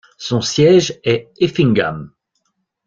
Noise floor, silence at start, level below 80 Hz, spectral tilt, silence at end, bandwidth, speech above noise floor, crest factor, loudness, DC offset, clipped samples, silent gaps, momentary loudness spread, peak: -70 dBFS; 0.2 s; -52 dBFS; -5.5 dB/octave; 0.8 s; 7.6 kHz; 55 dB; 14 dB; -15 LUFS; under 0.1%; under 0.1%; none; 10 LU; -2 dBFS